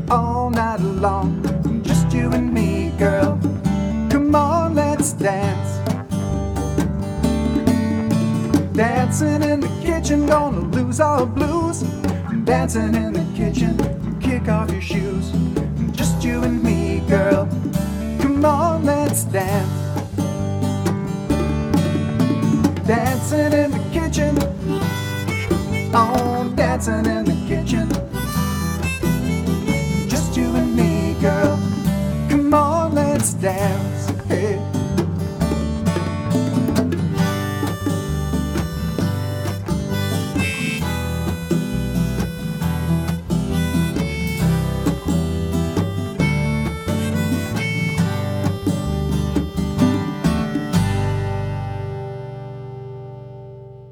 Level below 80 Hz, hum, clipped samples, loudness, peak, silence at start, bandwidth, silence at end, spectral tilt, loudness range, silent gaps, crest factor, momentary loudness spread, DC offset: -32 dBFS; none; under 0.1%; -20 LUFS; -2 dBFS; 0 s; 18.5 kHz; 0 s; -6.5 dB/octave; 4 LU; none; 18 dB; 6 LU; under 0.1%